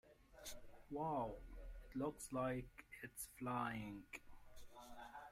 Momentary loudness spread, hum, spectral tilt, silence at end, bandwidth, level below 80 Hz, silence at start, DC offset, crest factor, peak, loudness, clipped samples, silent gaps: 17 LU; none; -5 dB/octave; 0 s; 16 kHz; -62 dBFS; 0.05 s; under 0.1%; 20 dB; -30 dBFS; -48 LUFS; under 0.1%; none